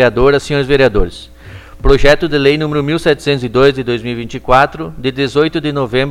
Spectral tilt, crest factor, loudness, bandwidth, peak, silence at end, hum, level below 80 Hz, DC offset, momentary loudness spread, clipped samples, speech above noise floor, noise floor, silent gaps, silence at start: -6 dB/octave; 12 dB; -13 LUFS; 13 kHz; 0 dBFS; 0 s; none; -24 dBFS; under 0.1%; 9 LU; 0.3%; 21 dB; -33 dBFS; none; 0 s